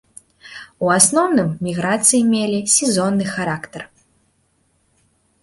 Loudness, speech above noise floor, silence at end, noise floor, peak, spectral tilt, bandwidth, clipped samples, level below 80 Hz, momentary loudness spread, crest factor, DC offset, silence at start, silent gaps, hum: -16 LUFS; 46 dB; 1.55 s; -63 dBFS; 0 dBFS; -3.5 dB/octave; 12 kHz; under 0.1%; -56 dBFS; 22 LU; 20 dB; under 0.1%; 0.45 s; none; none